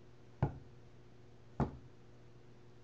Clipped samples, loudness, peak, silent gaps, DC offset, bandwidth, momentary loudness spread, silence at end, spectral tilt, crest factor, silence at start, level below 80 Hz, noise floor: under 0.1%; -42 LUFS; -22 dBFS; none; 0.1%; 7.4 kHz; 21 LU; 0 s; -8.5 dB/octave; 24 dB; 0 s; -56 dBFS; -61 dBFS